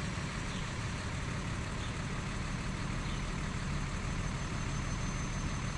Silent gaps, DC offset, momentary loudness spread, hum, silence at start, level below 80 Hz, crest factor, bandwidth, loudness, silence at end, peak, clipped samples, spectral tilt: none; under 0.1%; 1 LU; none; 0 s; -42 dBFS; 12 dB; 11.5 kHz; -38 LUFS; 0 s; -24 dBFS; under 0.1%; -4.5 dB/octave